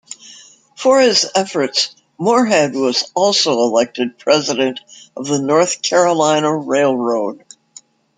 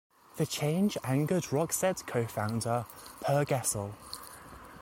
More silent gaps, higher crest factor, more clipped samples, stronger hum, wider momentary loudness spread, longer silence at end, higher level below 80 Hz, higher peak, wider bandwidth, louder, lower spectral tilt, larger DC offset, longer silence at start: neither; about the same, 16 dB vs 16 dB; neither; neither; second, 9 LU vs 15 LU; first, 0.85 s vs 0 s; about the same, -64 dBFS vs -62 dBFS; first, 0 dBFS vs -16 dBFS; second, 9.6 kHz vs 17 kHz; first, -15 LUFS vs -31 LUFS; second, -3 dB/octave vs -5 dB/octave; neither; second, 0.1 s vs 0.35 s